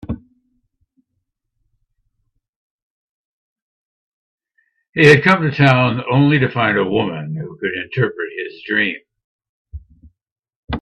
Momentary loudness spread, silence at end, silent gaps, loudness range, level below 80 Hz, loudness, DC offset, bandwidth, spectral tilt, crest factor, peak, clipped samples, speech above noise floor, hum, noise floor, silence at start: 17 LU; 0 s; 2.49-3.56 s, 3.62-4.38 s, 4.89-4.93 s, 9.24-9.39 s, 9.49-9.65 s, 10.32-10.36 s, 10.56-10.68 s; 9 LU; -46 dBFS; -15 LUFS; under 0.1%; 10.5 kHz; -7 dB/octave; 20 dB; 0 dBFS; under 0.1%; 59 dB; none; -74 dBFS; 0.1 s